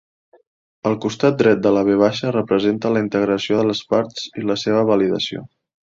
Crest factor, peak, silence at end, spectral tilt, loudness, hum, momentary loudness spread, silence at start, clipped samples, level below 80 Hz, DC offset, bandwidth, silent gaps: 16 dB; -2 dBFS; 0.5 s; -6 dB/octave; -18 LUFS; none; 8 LU; 0.85 s; under 0.1%; -56 dBFS; under 0.1%; 7.6 kHz; none